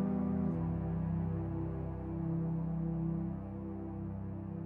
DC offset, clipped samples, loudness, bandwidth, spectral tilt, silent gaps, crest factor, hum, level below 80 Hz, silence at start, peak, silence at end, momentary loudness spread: under 0.1%; under 0.1%; -38 LUFS; 2.9 kHz; -12.5 dB/octave; none; 12 dB; none; -48 dBFS; 0 s; -24 dBFS; 0 s; 8 LU